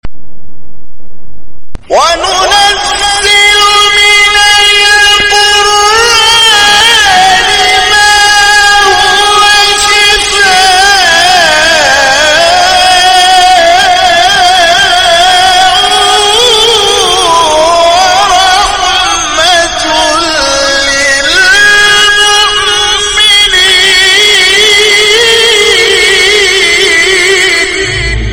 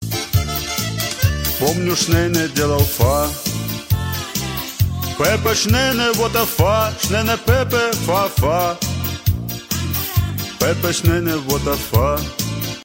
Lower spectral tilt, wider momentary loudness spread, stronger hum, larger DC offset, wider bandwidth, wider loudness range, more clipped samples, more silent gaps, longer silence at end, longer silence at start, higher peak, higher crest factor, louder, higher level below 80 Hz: second, 0 dB/octave vs -4.5 dB/octave; about the same, 5 LU vs 7 LU; neither; neither; first, 19.5 kHz vs 16.5 kHz; about the same, 3 LU vs 3 LU; first, 0.4% vs under 0.1%; neither; about the same, 0 s vs 0 s; about the same, 0 s vs 0 s; about the same, 0 dBFS vs -2 dBFS; second, 6 dB vs 16 dB; first, -3 LUFS vs -18 LUFS; about the same, -28 dBFS vs -32 dBFS